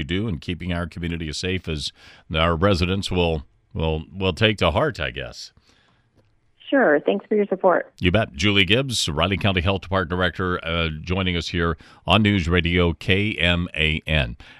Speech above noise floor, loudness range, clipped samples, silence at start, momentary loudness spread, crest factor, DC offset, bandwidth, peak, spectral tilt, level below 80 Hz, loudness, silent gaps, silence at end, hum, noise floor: 39 dB; 4 LU; under 0.1%; 0 s; 10 LU; 20 dB; under 0.1%; 12.5 kHz; -2 dBFS; -5.5 dB/octave; -38 dBFS; -21 LUFS; none; 0.05 s; none; -61 dBFS